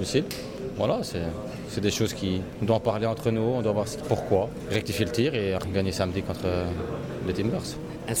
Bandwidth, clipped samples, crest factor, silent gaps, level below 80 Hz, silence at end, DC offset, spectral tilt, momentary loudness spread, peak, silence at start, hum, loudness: 17 kHz; under 0.1%; 18 dB; none; -48 dBFS; 0 s; under 0.1%; -5.5 dB/octave; 8 LU; -10 dBFS; 0 s; none; -28 LUFS